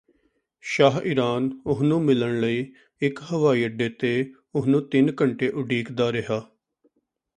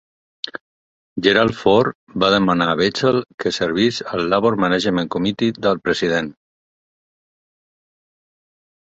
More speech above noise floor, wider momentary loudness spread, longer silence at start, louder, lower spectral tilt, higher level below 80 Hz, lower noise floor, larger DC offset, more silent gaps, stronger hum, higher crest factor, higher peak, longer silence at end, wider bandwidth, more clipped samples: second, 47 dB vs over 72 dB; second, 9 LU vs 15 LU; first, 0.65 s vs 0.45 s; second, -23 LUFS vs -18 LUFS; first, -7 dB/octave vs -5.5 dB/octave; second, -62 dBFS vs -52 dBFS; second, -70 dBFS vs under -90 dBFS; neither; second, none vs 0.61-1.16 s, 1.95-2.07 s, 3.34-3.38 s; neither; about the same, 20 dB vs 20 dB; second, -4 dBFS vs 0 dBFS; second, 0.9 s vs 2.6 s; first, 9.8 kHz vs 8.2 kHz; neither